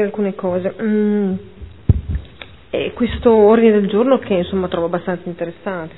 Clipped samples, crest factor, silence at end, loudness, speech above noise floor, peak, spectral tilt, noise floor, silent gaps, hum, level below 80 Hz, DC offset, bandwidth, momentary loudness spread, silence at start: under 0.1%; 16 dB; 0 s; -17 LUFS; 23 dB; 0 dBFS; -11.5 dB/octave; -39 dBFS; none; none; -32 dBFS; 0.5%; 4.1 kHz; 15 LU; 0 s